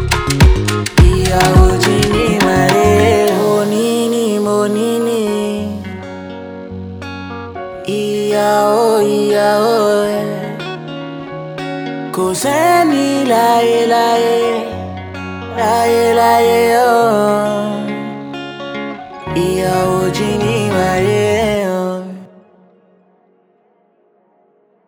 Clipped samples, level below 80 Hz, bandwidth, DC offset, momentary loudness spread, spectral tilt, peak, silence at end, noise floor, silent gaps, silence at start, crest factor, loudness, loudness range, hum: under 0.1%; -24 dBFS; over 20 kHz; under 0.1%; 15 LU; -5.5 dB/octave; 0 dBFS; 2.6 s; -55 dBFS; none; 0 s; 14 dB; -13 LUFS; 7 LU; none